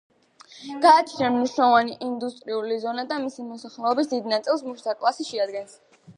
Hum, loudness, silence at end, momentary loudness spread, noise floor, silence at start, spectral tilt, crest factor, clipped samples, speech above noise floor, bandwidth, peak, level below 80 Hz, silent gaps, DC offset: none; -23 LUFS; 0.05 s; 17 LU; -51 dBFS; 0.55 s; -4 dB/octave; 20 dB; under 0.1%; 28 dB; 10.5 kHz; -4 dBFS; -76 dBFS; none; under 0.1%